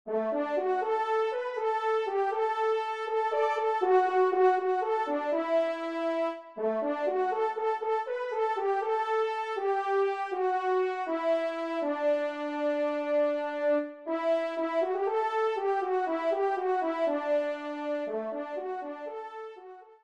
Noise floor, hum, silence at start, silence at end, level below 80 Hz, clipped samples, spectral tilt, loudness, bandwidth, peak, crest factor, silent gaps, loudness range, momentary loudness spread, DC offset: -49 dBFS; none; 0.05 s; 0.1 s; -82 dBFS; under 0.1%; -4.5 dB/octave; -29 LUFS; 9 kHz; -12 dBFS; 16 dB; none; 3 LU; 6 LU; under 0.1%